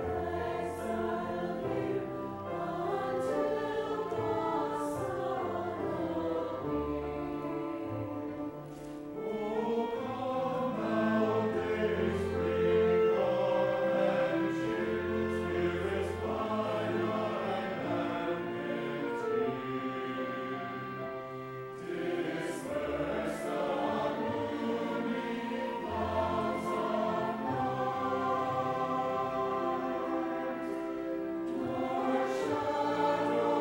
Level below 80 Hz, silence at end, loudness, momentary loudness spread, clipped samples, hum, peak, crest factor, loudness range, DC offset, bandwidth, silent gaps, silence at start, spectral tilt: -58 dBFS; 0 s; -33 LUFS; 8 LU; under 0.1%; none; -16 dBFS; 16 dB; 7 LU; under 0.1%; 16 kHz; none; 0 s; -6.5 dB/octave